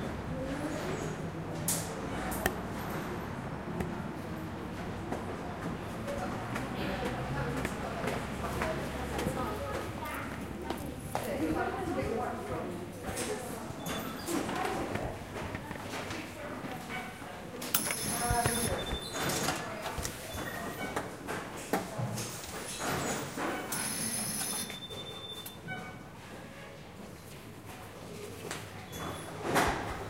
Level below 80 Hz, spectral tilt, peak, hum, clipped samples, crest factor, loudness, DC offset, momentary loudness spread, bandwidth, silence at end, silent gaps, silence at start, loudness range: -50 dBFS; -4 dB/octave; -8 dBFS; none; under 0.1%; 28 dB; -36 LUFS; under 0.1%; 10 LU; 16 kHz; 0 s; none; 0 s; 6 LU